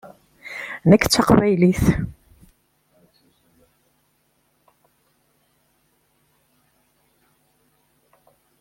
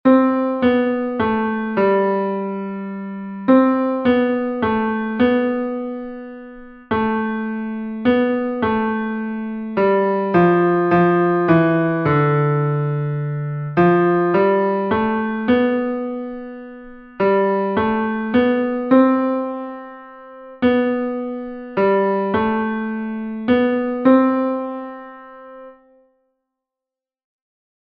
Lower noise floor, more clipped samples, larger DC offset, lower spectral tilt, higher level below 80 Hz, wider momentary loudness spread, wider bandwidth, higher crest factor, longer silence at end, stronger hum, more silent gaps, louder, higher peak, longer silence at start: second, -66 dBFS vs -88 dBFS; neither; neither; second, -5.5 dB/octave vs -10.5 dB/octave; first, -42 dBFS vs -52 dBFS; first, 19 LU vs 15 LU; first, 16.5 kHz vs 5 kHz; first, 22 dB vs 16 dB; first, 6.5 s vs 2.2 s; neither; neither; about the same, -18 LUFS vs -18 LUFS; about the same, -2 dBFS vs -2 dBFS; first, 0.45 s vs 0.05 s